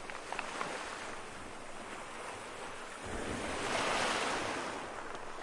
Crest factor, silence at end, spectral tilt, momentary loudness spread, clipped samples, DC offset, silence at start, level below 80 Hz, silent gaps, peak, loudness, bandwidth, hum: 20 dB; 0 s; -2.5 dB/octave; 13 LU; under 0.1%; under 0.1%; 0 s; -56 dBFS; none; -20 dBFS; -39 LUFS; 11.5 kHz; none